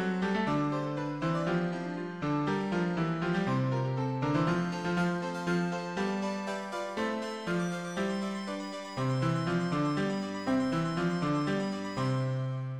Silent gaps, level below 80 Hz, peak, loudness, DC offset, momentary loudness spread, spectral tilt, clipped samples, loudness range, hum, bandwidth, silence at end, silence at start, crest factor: none; -60 dBFS; -16 dBFS; -32 LUFS; under 0.1%; 5 LU; -6.5 dB/octave; under 0.1%; 3 LU; none; 11 kHz; 0 s; 0 s; 14 dB